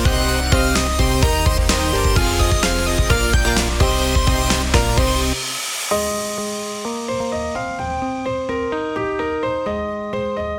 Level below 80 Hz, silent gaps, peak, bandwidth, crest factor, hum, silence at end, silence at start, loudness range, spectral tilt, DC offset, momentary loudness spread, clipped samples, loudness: -22 dBFS; none; -2 dBFS; 20 kHz; 16 dB; none; 0 s; 0 s; 6 LU; -4 dB/octave; under 0.1%; 8 LU; under 0.1%; -19 LUFS